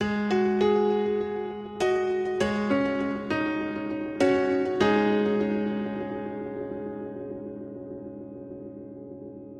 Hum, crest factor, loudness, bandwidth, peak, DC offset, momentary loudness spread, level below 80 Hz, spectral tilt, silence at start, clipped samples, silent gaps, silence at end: none; 18 dB; -27 LUFS; 10.5 kHz; -10 dBFS; under 0.1%; 18 LU; -58 dBFS; -6.5 dB/octave; 0 s; under 0.1%; none; 0 s